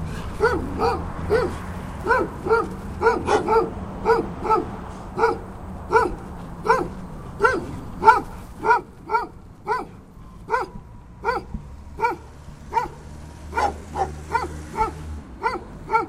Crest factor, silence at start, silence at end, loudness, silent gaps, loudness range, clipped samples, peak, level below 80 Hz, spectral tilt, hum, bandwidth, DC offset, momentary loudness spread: 24 dB; 0 s; 0 s; -23 LUFS; none; 7 LU; under 0.1%; 0 dBFS; -38 dBFS; -6 dB/octave; none; 15 kHz; under 0.1%; 16 LU